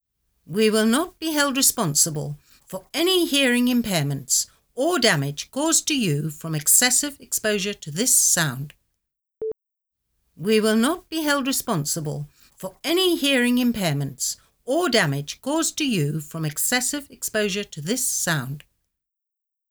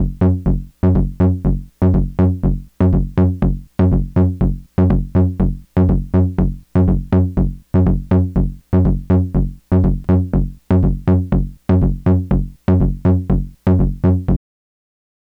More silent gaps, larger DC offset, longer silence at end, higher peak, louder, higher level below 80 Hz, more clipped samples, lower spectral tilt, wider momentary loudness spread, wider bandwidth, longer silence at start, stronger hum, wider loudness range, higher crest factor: neither; neither; about the same, 1.1 s vs 1 s; about the same, -4 dBFS vs -6 dBFS; second, -21 LUFS vs -17 LUFS; second, -58 dBFS vs -22 dBFS; neither; second, -3 dB/octave vs -11.5 dB/octave; first, 14 LU vs 5 LU; first, over 20 kHz vs 3.6 kHz; first, 0.5 s vs 0 s; neither; first, 4 LU vs 0 LU; first, 20 dB vs 10 dB